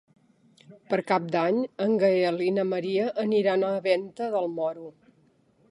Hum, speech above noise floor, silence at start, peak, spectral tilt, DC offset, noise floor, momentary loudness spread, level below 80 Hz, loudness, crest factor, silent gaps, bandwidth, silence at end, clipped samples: none; 38 dB; 0.7 s; -8 dBFS; -7 dB/octave; under 0.1%; -64 dBFS; 7 LU; -78 dBFS; -26 LUFS; 18 dB; none; 11 kHz; 0.8 s; under 0.1%